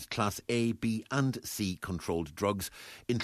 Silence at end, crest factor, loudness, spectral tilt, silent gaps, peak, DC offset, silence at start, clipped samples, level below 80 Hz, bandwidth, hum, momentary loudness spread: 0 s; 18 dB; -33 LUFS; -5 dB/octave; none; -14 dBFS; under 0.1%; 0 s; under 0.1%; -58 dBFS; 14 kHz; none; 6 LU